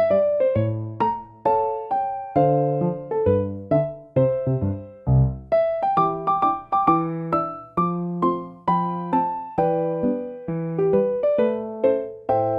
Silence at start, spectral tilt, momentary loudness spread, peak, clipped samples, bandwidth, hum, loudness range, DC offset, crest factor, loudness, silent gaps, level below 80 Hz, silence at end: 0 s; -11 dB/octave; 6 LU; -4 dBFS; under 0.1%; 5 kHz; none; 2 LU; under 0.1%; 18 dB; -22 LUFS; none; -44 dBFS; 0 s